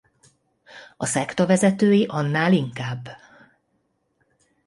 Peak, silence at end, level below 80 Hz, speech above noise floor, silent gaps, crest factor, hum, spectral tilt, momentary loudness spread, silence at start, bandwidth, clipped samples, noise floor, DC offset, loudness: -6 dBFS; 1.5 s; -64 dBFS; 50 dB; none; 18 dB; none; -5.5 dB/octave; 13 LU; 0.75 s; 11.5 kHz; under 0.1%; -70 dBFS; under 0.1%; -21 LUFS